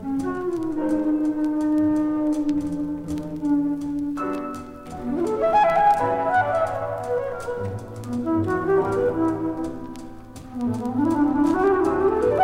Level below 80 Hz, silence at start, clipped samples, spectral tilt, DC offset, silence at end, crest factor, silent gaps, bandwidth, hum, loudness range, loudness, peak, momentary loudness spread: -48 dBFS; 0 s; under 0.1%; -7.5 dB/octave; under 0.1%; 0 s; 14 dB; none; 12 kHz; none; 3 LU; -23 LUFS; -8 dBFS; 12 LU